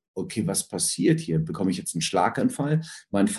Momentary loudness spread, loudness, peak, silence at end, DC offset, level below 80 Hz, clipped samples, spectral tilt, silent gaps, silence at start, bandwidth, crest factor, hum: 5 LU; -25 LUFS; -8 dBFS; 0 s; under 0.1%; -56 dBFS; under 0.1%; -4.5 dB/octave; none; 0.15 s; 12.5 kHz; 18 dB; none